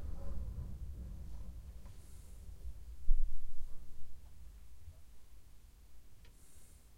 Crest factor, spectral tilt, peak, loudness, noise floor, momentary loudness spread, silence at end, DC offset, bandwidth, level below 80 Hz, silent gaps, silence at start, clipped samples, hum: 20 dB; -6.5 dB/octave; -14 dBFS; -49 LUFS; -56 dBFS; 20 LU; 0.3 s; under 0.1%; 1.4 kHz; -40 dBFS; none; 0 s; under 0.1%; none